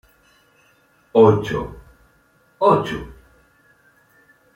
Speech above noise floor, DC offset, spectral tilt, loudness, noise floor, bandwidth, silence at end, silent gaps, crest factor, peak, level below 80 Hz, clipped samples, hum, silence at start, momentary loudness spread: 42 dB; under 0.1%; -7.5 dB/octave; -18 LUFS; -58 dBFS; 12 kHz; 1.45 s; none; 20 dB; -2 dBFS; -48 dBFS; under 0.1%; none; 1.15 s; 19 LU